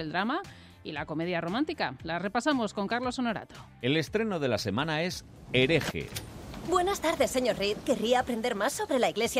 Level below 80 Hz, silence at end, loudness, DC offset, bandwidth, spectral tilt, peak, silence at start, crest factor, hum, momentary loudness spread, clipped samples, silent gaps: -54 dBFS; 0 s; -29 LUFS; under 0.1%; 16 kHz; -4.5 dB/octave; -12 dBFS; 0 s; 18 dB; none; 12 LU; under 0.1%; none